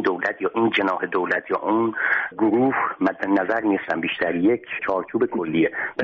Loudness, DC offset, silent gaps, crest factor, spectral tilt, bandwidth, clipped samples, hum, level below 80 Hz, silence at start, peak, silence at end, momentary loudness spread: -22 LUFS; under 0.1%; none; 14 dB; -3.5 dB/octave; 6.2 kHz; under 0.1%; none; -64 dBFS; 0 s; -6 dBFS; 0 s; 4 LU